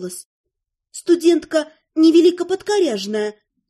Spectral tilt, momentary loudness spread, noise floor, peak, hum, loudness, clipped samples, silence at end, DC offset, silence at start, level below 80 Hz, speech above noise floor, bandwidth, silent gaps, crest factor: -4 dB/octave; 17 LU; -75 dBFS; -4 dBFS; none; -17 LUFS; under 0.1%; 0.4 s; under 0.1%; 0 s; -64 dBFS; 58 dB; 12.5 kHz; 0.25-0.44 s; 14 dB